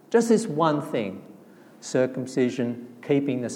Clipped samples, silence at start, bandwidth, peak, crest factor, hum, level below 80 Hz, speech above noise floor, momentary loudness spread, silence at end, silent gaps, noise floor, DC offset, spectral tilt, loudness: under 0.1%; 0.1 s; 16 kHz; -8 dBFS; 18 dB; none; -80 dBFS; 25 dB; 14 LU; 0 s; none; -50 dBFS; under 0.1%; -6 dB/octave; -25 LUFS